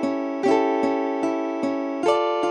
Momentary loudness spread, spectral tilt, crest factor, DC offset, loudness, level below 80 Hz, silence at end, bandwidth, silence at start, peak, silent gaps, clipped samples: 5 LU; -5 dB/octave; 16 dB; under 0.1%; -23 LUFS; -70 dBFS; 0 s; 11 kHz; 0 s; -6 dBFS; none; under 0.1%